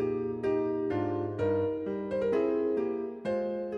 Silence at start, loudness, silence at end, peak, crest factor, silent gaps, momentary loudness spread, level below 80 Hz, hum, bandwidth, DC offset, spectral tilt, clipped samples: 0 s; -31 LUFS; 0 s; -16 dBFS; 14 dB; none; 5 LU; -62 dBFS; none; 7 kHz; under 0.1%; -9 dB/octave; under 0.1%